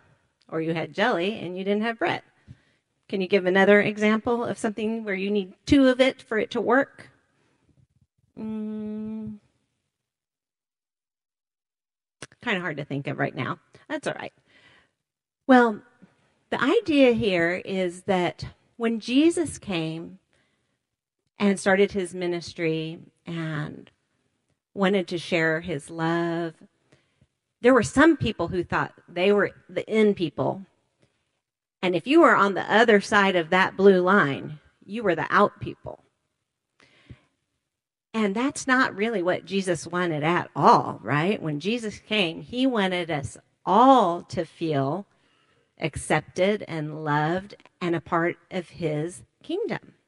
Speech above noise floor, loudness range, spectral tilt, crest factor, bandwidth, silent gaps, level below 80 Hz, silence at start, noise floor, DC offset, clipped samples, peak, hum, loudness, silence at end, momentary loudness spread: over 67 dB; 10 LU; -5.5 dB/octave; 22 dB; 11.5 kHz; none; -58 dBFS; 0.5 s; under -90 dBFS; under 0.1%; under 0.1%; -2 dBFS; none; -24 LUFS; 0.3 s; 15 LU